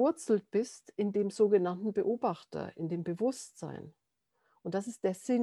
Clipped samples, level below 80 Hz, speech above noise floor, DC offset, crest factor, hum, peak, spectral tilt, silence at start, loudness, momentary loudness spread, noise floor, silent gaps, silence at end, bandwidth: under 0.1%; -78 dBFS; 46 dB; under 0.1%; 18 dB; none; -14 dBFS; -6.5 dB/octave; 0 s; -33 LUFS; 15 LU; -78 dBFS; none; 0 s; 12 kHz